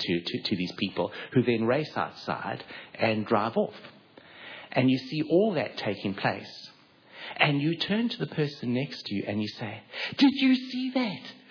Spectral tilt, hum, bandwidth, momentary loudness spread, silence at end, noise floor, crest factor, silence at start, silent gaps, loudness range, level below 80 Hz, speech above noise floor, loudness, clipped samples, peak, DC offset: -7 dB/octave; none; 5.4 kHz; 15 LU; 0.15 s; -54 dBFS; 24 dB; 0 s; none; 2 LU; -72 dBFS; 26 dB; -28 LUFS; under 0.1%; -6 dBFS; under 0.1%